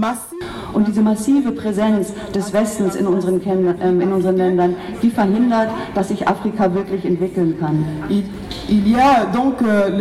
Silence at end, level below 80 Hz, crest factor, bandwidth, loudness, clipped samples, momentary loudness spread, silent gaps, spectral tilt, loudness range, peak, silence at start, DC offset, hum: 0 s; -44 dBFS; 12 dB; 13.5 kHz; -17 LUFS; under 0.1%; 6 LU; none; -6.5 dB/octave; 2 LU; -4 dBFS; 0 s; under 0.1%; none